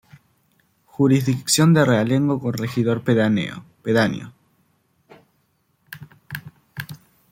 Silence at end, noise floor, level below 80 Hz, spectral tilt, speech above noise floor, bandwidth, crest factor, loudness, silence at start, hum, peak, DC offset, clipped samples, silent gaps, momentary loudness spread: 0.35 s; -66 dBFS; -60 dBFS; -5.5 dB/octave; 48 dB; 16.5 kHz; 18 dB; -19 LUFS; 1 s; none; -4 dBFS; under 0.1%; under 0.1%; none; 24 LU